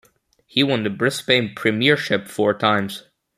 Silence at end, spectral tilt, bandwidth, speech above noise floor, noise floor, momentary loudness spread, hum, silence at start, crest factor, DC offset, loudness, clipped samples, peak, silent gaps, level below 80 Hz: 0.35 s; -4.5 dB/octave; 15 kHz; 38 dB; -58 dBFS; 6 LU; none; 0.55 s; 20 dB; under 0.1%; -19 LUFS; under 0.1%; 0 dBFS; none; -62 dBFS